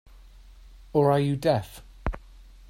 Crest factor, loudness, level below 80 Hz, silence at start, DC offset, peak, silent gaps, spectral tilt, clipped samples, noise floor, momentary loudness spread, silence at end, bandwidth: 20 dB; -26 LUFS; -42 dBFS; 0.95 s; under 0.1%; -8 dBFS; none; -7.5 dB/octave; under 0.1%; -49 dBFS; 18 LU; 0.25 s; 16 kHz